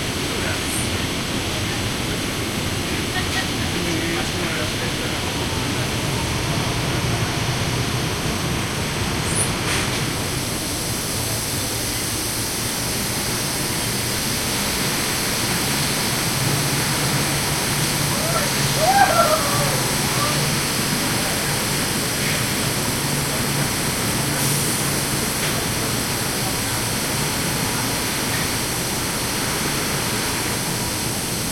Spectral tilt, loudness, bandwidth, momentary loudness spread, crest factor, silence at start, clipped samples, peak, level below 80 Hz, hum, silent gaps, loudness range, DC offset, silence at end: -3 dB/octave; -20 LUFS; 16.5 kHz; 4 LU; 20 dB; 0 s; under 0.1%; -2 dBFS; -38 dBFS; none; none; 4 LU; under 0.1%; 0 s